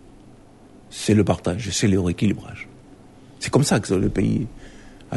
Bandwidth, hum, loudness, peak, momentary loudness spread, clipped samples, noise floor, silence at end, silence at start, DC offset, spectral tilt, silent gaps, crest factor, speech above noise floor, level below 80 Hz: 11.5 kHz; none; -21 LUFS; -4 dBFS; 17 LU; under 0.1%; -47 dBFS; 0 s; 0.9 s; under 0.1%; -5.5 dB/octave; none; 18 dB; 27 dB; -42 dBFS